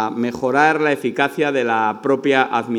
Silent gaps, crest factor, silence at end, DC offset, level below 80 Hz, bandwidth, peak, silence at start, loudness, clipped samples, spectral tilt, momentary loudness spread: none; 18 dB; 0 s; under 0.1%; -64 dBFS; 15 kHz; 0 dBFS; 0 s; -18 LUFS; under 0.1%; -5.5 dB/octave; 4 LU